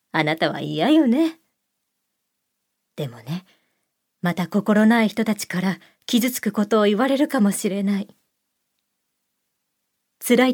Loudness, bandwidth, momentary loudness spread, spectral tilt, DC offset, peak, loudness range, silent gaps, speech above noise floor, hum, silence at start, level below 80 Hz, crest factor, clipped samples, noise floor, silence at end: -20 LUFS; 19.5 kHz; 15 LU; -5 dB/octave; under 0.1%; -2 dBFS; 7 LU; none; 57 dB; none; 0.15 s; -74 dBFS; 20 dB; under 0.1%; -77 dBFS; 0 s